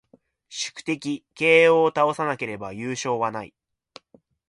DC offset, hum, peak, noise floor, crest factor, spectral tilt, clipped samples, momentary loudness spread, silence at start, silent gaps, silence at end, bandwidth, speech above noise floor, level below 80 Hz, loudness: under 0.1%; none; -4 dBFS; -59 dBFS; 20 dB; -4 dB/octave; under 0.1%; 16 LU; 0.5 s; none; 1 s; 11.5 kHz; 36 dB; -66 dBFS; -22 LUFS